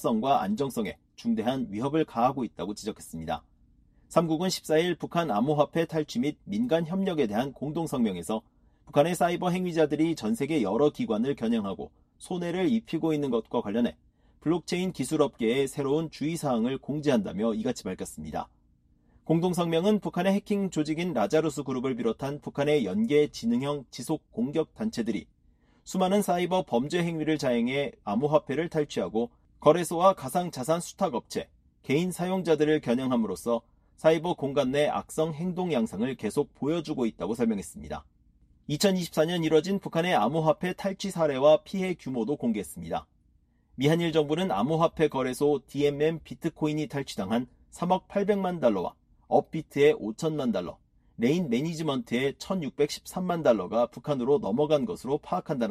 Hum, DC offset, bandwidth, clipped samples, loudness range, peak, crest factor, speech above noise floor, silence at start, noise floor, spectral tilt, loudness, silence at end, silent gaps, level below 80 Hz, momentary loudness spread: none; under 0.1%; 14.5 kHz; under 0.1%; 3 LU; -8 dBFS; 20 dB; 38 dB; 0 s; -65 dBFS; -6 dB/octave; -28 LUFS; 0 s; none; -60 dBFS; 9 LU